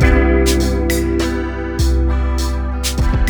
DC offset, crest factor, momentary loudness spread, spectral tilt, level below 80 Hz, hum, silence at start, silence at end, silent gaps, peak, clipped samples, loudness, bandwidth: under 0.1%; 14 dB; 7 LU; -5.5 dB/octave; -16 dBFS; none; 0 s; 0 s; none; 0 dBFS; under 0.1%; -17 LUFS; over 20 kHz